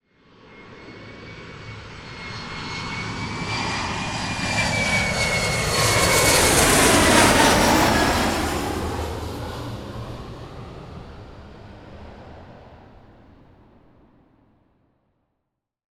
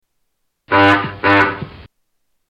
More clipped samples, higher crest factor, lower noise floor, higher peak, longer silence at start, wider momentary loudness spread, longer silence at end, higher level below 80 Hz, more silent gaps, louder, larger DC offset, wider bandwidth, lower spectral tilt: neither; about the same, 20 dB vs 16 dB; first, -80 dBFS vs -68 dBFS; about the same, -2 dBFS vs -2 dBFS; second, 0.5 s vs 0.7 s; first, 25 LU vs 15 LU; first, 3.25 s vs 0.7 s; first, -38 dBFS vs -48 dBFS; neither; second, -19 LUFS vs -13 LUFS; neither; first, 19 kHz vs 9.2 kHz; second, -3 dB/octave vs -6.5 dB/octave